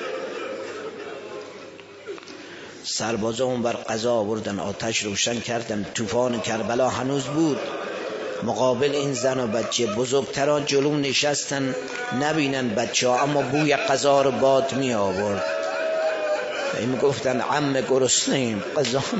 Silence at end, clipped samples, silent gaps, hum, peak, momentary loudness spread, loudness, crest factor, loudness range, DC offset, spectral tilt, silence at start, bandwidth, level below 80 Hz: 0 s; under 0.1%; none; none; -6 dBFS; 14 LU; -23 LUFS; 18 dB; 6 LU; under 0.1%; -3.5 dB/octave; 0 s; 8 kHz; -62 dBFS